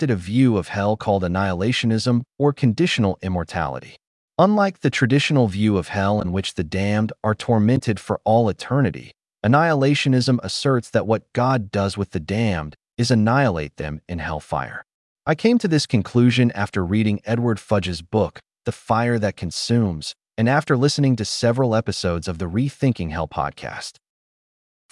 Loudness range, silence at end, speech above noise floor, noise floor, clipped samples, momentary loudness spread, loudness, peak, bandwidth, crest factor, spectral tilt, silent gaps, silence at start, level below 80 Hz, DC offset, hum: 3 LU; 1 s; over 70 dB; under -90 dBFS; under 0.1%; 10 LU; -21 LUFS; -4 dBFS; 12 kHz; 16 dB; -6 dB/octave; 4.07-4.28 s, 14.94-15.16 s; 0 s; -50 dBFS; under 0.1%; none